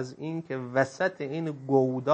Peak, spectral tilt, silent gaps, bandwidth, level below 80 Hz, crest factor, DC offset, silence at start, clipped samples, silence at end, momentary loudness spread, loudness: -8 dBFS; -7 dB/octave; none; 8.6 kHz; -76 dBFS; 20 dB; under 0.1%; 0 s; under 0.1%; 0 s; 9 LU; -29 LUFS